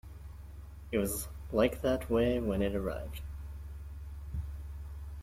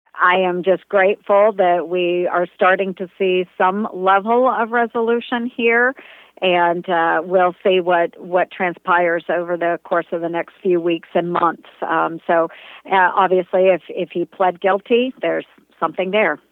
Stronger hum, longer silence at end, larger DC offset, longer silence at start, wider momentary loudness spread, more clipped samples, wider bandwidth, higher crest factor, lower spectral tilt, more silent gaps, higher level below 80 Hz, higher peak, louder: neither; second, 0 s vs 0.15 s; neither; about the same, 0.05 s vs 0.15 s; first, 19 LU vs 7 LU; neither; first, 16.5 kHz vs 4.1 kHz; about the same, 20 dB vs 16 dB; second, -6 dB/octave vs -8 dB/octave; neither; first, -44 dBFS vs -74 dBFS; second, -14 dBFS vs -2 dBFS; second, -34 LUFS vs -18 LUFS